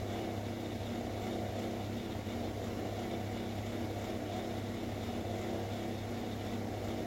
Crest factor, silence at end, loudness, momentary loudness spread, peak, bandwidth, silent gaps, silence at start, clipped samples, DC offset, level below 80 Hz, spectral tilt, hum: 14 dB; 0 s; -39 LUFS; 1 LU; -26 dBFS; 16.5 kHz; none; 0 s; under 0.1%; under 0.1%; -54 dBFS; -6 dB/octave; none